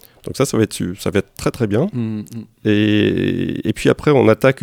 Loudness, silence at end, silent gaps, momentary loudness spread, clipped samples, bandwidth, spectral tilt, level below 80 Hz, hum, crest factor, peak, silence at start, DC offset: -17 LUFS; 0.1 s; none; 10 LU; under 0.1%; 17 kHz; -6 dB/octave; -44 dBFS; none; 16 dB; 0 dBFS; 0.25 s; under 0.1%